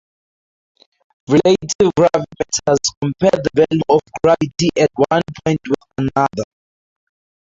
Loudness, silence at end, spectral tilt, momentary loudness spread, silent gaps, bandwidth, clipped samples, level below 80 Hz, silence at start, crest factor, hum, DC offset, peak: -16 LUFS; 1.1 s; -5 dB/octave; 7 LU; 1.75-1.79 s, 2.97-3.01 s; 8 kHz; under 0.1%; -48 dBFS; 1.3 s; 16 dB; none; under 0.1%; -2 dBFS